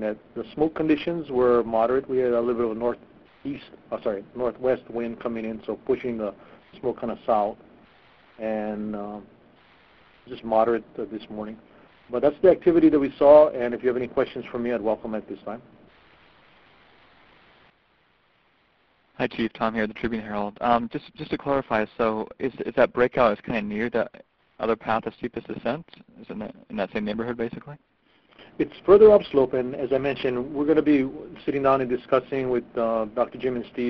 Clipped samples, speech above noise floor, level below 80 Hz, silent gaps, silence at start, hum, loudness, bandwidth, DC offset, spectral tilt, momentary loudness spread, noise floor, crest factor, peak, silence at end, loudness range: under 0.1%; 40 dB; -56 dBFS; none; 0 s; none; -24 LUFS; 6 kHz; under 0.1%; -9 dB/octave; 16 LU; -64 dBFS; 22 dB; -2 dBFS; 0 s; 12 LU